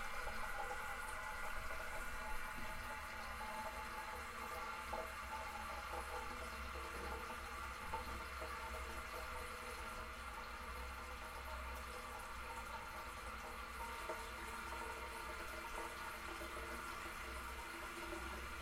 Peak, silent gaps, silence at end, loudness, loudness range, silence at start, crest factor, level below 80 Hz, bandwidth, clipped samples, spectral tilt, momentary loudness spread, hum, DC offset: -32 dBFS; none; 0 s; -47 LUFS; 2 LU; 0 s; 16 dB; -54 dBFS; 16 kHz; under 0.1%; -3 dB/octave; 3 LU; none; under 0.1%